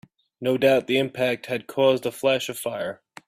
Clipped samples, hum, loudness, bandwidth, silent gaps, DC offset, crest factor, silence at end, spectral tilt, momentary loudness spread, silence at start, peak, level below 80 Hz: under 0.1%; none; -23 LUFS; 16 kHz; none; under 0.1%; 18 dB; 0.3 s; -4.5 dB/octave; 10 LU; 0.4 s; -6 dBFS; -66 dBFS